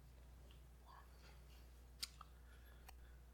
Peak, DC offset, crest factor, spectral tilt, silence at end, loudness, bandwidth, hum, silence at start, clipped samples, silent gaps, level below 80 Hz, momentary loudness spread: -30 dBFS; under 0.1%; 30 dB; -2.5 dB/octave; 0 s; -59 LUFS; 18 kHz; none; 0 s; under 0.1%; none; -62 dBFS; 12 LU